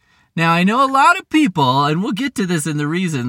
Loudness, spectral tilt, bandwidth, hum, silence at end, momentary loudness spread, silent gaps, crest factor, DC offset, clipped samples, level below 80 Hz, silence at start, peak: -16 LUFS; -5 dB/octave; 17 kHz; none; 0 s; 8 LU; none; 16 dB; under 0.1%; under 0.1%; -60 dBFS; 0.35 s; 0 dBFS